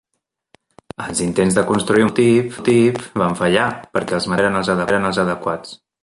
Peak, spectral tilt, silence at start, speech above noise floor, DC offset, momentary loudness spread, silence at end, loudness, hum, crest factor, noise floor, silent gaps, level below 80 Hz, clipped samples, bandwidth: 0 dBFS; -5 dB/octave; 1 s; 59 dB; under 0.1%; 9 LU; 0.25 s; -17 LUFS; none; 18 dB; -76 dBFS; none; -50 dBFS; under 0.1%; 11.5 kHz